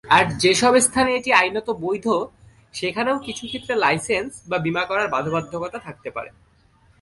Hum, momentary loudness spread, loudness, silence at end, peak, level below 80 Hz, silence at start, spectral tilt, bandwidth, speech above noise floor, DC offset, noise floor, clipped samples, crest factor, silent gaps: none; 16 LU; -20 LUFS; 0.7 s; -2 dBFS; -52 dBFS; 0.05 s; -3 dB/octave; 11.5 kHz; 36 dB; under 0.1%; -57 dBFS; under 0.1%; 20 dB; none